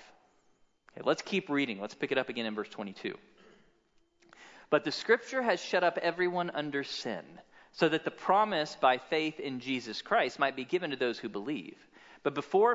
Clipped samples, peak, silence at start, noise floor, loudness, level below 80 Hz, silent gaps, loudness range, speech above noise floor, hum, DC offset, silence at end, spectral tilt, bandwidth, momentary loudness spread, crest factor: under 0.1%; -12 dBFS; 0 s; -70 dBFS; -32 LUFS; -78 dBFS; none; 5 LU; 38 dB; none; under 0.1%; 0 s; -4.5 dB/octave; 7.8 kHz; 11 LU; 20 dB